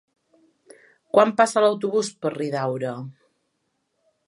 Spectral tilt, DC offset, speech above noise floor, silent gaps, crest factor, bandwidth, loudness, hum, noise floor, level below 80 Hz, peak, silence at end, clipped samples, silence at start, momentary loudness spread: -5 dB/octave; under 0.1%; 53 dB; none; 22 dB; 11.5 kHz; -22 LUFS; none; -74 dBFS; -78 dBFS; -2 dBFS; 1.15 s; under 0.1%; 1.15 s; 12 LU